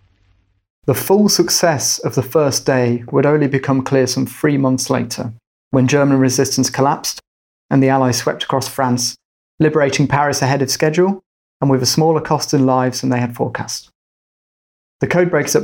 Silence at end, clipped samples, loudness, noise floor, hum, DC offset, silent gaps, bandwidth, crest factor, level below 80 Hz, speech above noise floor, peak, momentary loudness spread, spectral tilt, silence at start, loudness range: 0 s; under 0.1%; -16 LUFS; -58 dBFS; none; under 0.1%; 5.47-5.71 s, 7.27-7.69 s, 9.25-9.58 s, 11.26-11.60 s, 13.95-14.99 s; 17 kHz; 14 dB; -54 dBFS; 43 dB; -2 dBFS; 8 LU; -4.5 dB/octave; 0.85 s; 2 LU